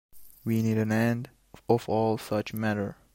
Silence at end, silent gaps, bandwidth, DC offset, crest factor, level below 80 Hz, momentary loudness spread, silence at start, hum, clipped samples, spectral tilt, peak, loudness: 0.2 s; none; 16.5 kHz; under 0.1%; 20 dB; -62 dBFS; 11 LU; 0.15 s; none; under 0.1%; -7 dB/octave; -8 dBFS; -28 LUFS